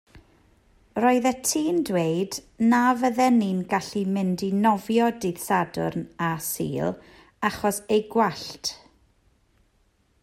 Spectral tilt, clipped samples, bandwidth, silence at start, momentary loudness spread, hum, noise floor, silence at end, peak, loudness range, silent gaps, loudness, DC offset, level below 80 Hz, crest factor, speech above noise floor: -5 dB/octave; under 0.1%; 16 kHz; 0.15 s; 10 LU; none; -65 dBFS; 1.45 s; -8 dBFS; 5 LU; none; -24 LUFS; under 0.1%; -60 dBFS; 16 dB; 42 dB